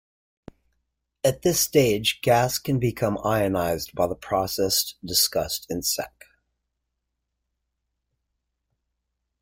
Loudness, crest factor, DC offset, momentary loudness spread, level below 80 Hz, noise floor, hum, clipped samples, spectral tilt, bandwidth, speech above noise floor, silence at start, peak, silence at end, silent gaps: -23 LUFS; 20 dB; under 0.1%; 7 LU; -52 dBFS; -80 dBFS; none; under 0.1%; -3.5 dB/octave; 16.5 kHz; 57 dB; 1.25 s; -6 dBFS; 3.35 s; none